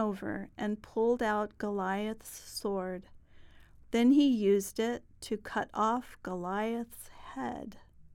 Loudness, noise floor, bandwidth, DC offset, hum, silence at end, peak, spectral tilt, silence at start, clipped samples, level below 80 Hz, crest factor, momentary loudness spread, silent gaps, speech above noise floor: -32 LUFS; -55 dBFS; 17 kHz; under 0.1%; none; 0.15 s; -16 dBFS; -5.5 dB/octave; 0 s; under 0.1%; -60 dBFS; 16 dB; 16 LU; none; 23 dB